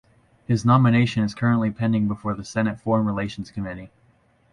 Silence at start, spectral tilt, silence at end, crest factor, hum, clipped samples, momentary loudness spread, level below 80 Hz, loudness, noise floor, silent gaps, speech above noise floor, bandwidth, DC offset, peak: 0.5 s; -7.5 dB/octave; 0.65 s; 18 dB; none; under 0.1%; 15 LU; -50 dBFS; -22 LUFS; -60 dBFS; none; 39 dB; 11 kHz; under 0.1%; -6 dBFS